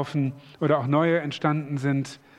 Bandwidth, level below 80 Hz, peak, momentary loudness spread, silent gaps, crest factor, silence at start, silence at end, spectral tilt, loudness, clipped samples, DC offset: 10.5 kHz; -68 dBFS; -8 dBFS; 7 LU; none; 18 dB; 0 s; 0.2 s; -7.5 dB/octave; -25 LUFS; under 0.1%; under 0.1%